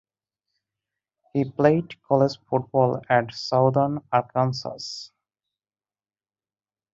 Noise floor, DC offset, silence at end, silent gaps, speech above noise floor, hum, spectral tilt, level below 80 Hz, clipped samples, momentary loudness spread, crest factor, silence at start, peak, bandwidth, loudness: under -90 dBFS; under 0.1%; 1.85 s; none; over 67 dB; none; -7 dB/octave; -64 dBFS; under 0.1%; 11 LU; 20 dB; 1.35 s; -4 dBFS; 7.8 kHz; -23 LUFS